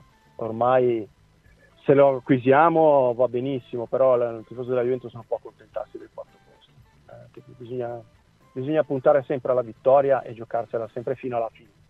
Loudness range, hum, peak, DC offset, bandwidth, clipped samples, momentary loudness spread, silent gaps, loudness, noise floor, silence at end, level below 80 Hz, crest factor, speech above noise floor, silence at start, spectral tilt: 14 LU; none; -4 dBFS; under 0.1%; 4.3 kHz; under 0.1%; 18 LU; none; -22 LUFS; -56 dBFS; 0.4 s; -64 dBFS; 20 dB; 34 dB; 0.4 s; -9.5 dB/octave